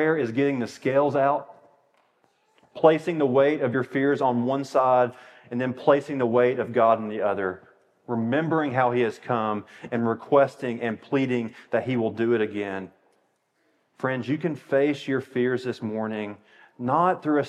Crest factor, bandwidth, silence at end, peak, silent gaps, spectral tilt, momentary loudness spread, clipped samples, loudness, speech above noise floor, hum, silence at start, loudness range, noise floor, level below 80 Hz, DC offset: 22 dB; 11 kHz; 0 s; -4 dBFS; none; -7.5 dB/octave; 9 LU; under 0.1%; -24 LUFS; 46 dB; none; 0 s; 5 LU; -69 dBFS; -80 dBFS; under 0.1%